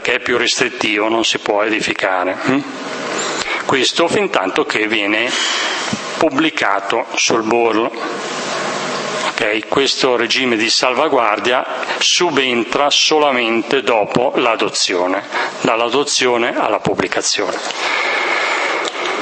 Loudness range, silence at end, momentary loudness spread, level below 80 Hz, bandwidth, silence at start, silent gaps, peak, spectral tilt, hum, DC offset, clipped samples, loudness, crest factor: 3 LU; 0 s; 7 LU; -58 dBFS; 8.8 kHz; 0 s; none; 0 dBFS; -2 dB/octave; none; under 0.1%; under 0.1%; -15 LUFS; 16 dB